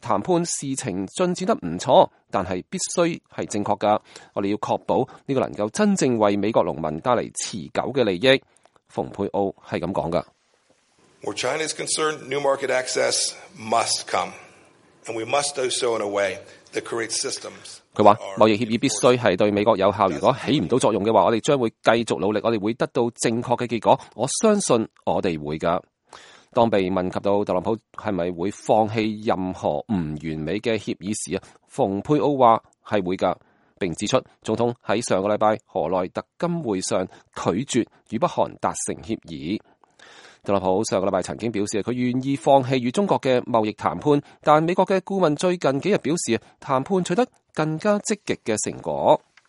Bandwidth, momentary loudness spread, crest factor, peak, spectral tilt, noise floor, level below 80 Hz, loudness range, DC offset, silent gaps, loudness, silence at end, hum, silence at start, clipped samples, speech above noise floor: 11.5 kHz; 10 LU; 22 dB; 0 dBFS; -4.5 dB/octave; -63 dBFS; -58 dBFS; 6 LU; under 0.1%; none; -23 LUFS; 0.3 s; none; 0.05 s; under 0.1%; 41 dB